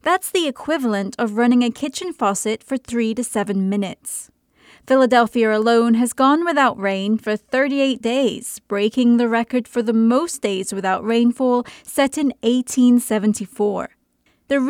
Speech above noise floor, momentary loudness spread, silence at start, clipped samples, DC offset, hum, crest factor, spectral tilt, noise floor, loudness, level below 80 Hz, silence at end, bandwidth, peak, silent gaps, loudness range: 45 dB; 8 LU; 0.05 s; under 0.1%; under 0.1%; none; 16 dB; -4.5 dB/octave; -63 dBFS; -19 LUFS; -62 dBFS; 0 s; 16 kHz; -4 dBFS; none; 3 LU